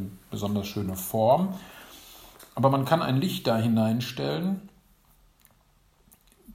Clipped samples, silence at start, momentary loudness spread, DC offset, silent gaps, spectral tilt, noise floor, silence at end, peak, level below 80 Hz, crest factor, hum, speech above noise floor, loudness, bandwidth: under 0.1%; 0 s; 22 LU; under 0.1%; none; -6.5 dB/octave; -63 dBFS; 0 s; -6 dBFS; -60 dBFS; 22 dB; none; 37 dB; -26 LUFS; 16 kHz